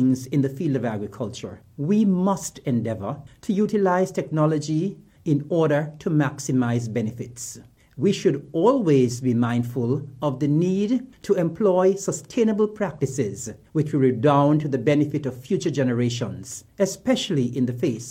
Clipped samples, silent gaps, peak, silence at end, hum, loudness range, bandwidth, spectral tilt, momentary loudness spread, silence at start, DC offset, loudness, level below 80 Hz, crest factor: under 0.1%; none; -6 dBFS; 0 s; none; 2 LU; 16 kHz; -6.5 dB/octave; 11 LU; 0 s; under 0.1%; -23 LUFS; -60 dBFS; 16 dB